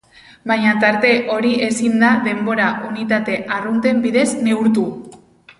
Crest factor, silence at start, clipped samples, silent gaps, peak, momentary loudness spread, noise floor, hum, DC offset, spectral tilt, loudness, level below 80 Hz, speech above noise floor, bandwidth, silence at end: 16 dB; 0.45 s; under 0.1%; none; -2 dBFS; 7 LU; -44 dBFS; none; under 0.1%; -5 dB/octave; -16 LUFS; -58 dBFS; 28 dB; 11.5 kHz; 0.45 s